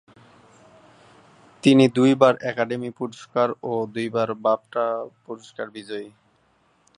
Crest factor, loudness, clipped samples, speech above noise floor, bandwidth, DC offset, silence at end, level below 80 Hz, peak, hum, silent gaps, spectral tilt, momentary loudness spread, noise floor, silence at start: 22 dB; -22 LUFS; under 0.1%; 41 dB; 11 kHz; under 0.1%; 0.9 s; -70 dBFS; -2 dBFS; none; none; -6.5 dB/octave; 18 LU; -63 dBFS; 1.65 s